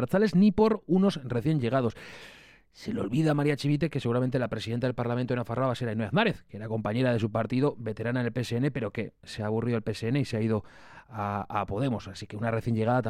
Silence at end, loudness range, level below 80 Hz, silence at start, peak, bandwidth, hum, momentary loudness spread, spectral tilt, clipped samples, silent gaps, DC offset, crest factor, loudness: 0 s; 3 LU; -56 dBFS; 0 s; -12 dBFS; 13.5 kHz; none; 11 LU; -7.5 dB/octave; under 0.1%; none; under 0.1%; 16 dB; -28 LUFS